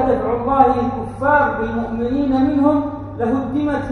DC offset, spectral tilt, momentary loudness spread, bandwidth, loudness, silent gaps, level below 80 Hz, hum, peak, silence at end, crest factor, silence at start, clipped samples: under 0.1%; -8.5 dB/octave; 7 LU; 6.4 kHz; -18 LUFS; none; -38 dBFS; none; 0 dBFS; 0 s; 18 dB; 0 s; under 0.1%